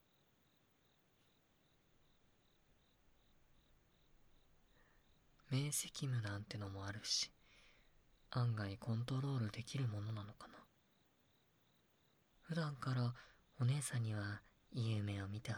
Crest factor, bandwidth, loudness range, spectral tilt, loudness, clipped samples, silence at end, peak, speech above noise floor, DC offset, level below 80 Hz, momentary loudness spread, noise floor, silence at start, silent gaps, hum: 18 dB; 15.5 kHz; 6 LU; -4.5 dB/octave; -43 LUFS; under 0.1%; 0 s; -28 dBFS; 35 dB; under 0.1%; -74 dBFS; 9 LU; -77 dBFS; 5.5 s; none; none